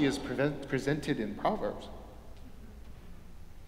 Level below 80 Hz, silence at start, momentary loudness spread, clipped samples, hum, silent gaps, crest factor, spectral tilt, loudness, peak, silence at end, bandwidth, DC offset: -50 dBFS; 0 s; 21 LU; under 0.1%; none; none; 20 dB; -6 dB/octave; -33 LUFS; -14 dBFS; 0 s; 16 kHz; under 0.1%